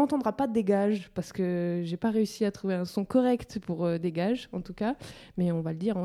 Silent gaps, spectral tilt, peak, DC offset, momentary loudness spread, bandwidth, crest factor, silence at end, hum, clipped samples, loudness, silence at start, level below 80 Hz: none; -7.5 dB/octave; -12 dBFS; under 0.1%; 7 LU; 14 kHz; 16 dB; 0 s; none; under 0.1%; -29 LUFS; 0 s; -60 dBFS